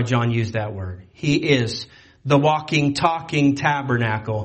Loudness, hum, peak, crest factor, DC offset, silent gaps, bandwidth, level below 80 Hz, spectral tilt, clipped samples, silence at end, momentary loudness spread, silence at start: -20 LUFS; none; -2 dBFS; 18 dB; under 0.1%; none; 8.8 kHz; -52 dBFS; -6 dB/octave; under 0.1%; 0 s; 13 LU; 0 s